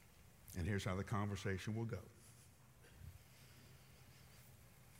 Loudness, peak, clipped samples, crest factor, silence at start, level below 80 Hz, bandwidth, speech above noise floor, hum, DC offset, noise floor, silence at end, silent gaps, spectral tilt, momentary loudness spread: -44 LUFS; -28 dBFS; under 0.1%; 20 dB; 0 s; -68 dBFS; 16 kHz; 22 dB; none; under 0.1%; -65 dBFS; 0 s; none; -6 dB/octave; 22 LU